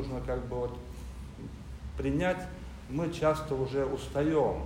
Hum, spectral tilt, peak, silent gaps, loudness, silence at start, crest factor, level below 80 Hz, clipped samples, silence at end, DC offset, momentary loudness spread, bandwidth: none; -7 dB/octave; -14 dBFS; none; -32 LUFS; 0 s; 18 dB; -44 dBFS; under 0.1%; 0 s; under 0.1%; 15 LU; 16 kHz